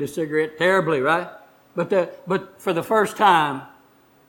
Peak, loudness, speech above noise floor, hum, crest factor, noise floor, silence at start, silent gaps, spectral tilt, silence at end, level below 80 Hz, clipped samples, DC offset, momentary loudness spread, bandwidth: -2 dBFS; -21 LUFS; 35 dB; none; 20 dB; -55 dBFS; 0 s; none; -5 dB/octave; 0.6 s; -64 dBFS; under 0.1%; under 0.1%; 11 LU; 19 kHz